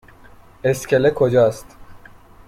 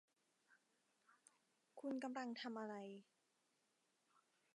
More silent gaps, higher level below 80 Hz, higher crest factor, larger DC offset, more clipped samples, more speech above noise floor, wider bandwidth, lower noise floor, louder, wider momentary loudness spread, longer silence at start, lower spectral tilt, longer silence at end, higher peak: neither; first, -48 dBFS vs under -90 dBFS; about the same, 16 dB vs 20 dB; neither; neither; second, 28 dB vs 36 dB; first, 16 kHz vs 11 kHz; second, -45 dBFS vs -85 dBFS; first, -18 LUFS vs -50 LUFS; second, 8 LU vs 13 LU; first, 0.65 s vs 0.5 s; first, -6 dB/octave vs -4.5 dB/octave; second, 0.5 s vs 1.55 s; first, -4 dBFS vs -34 dBFS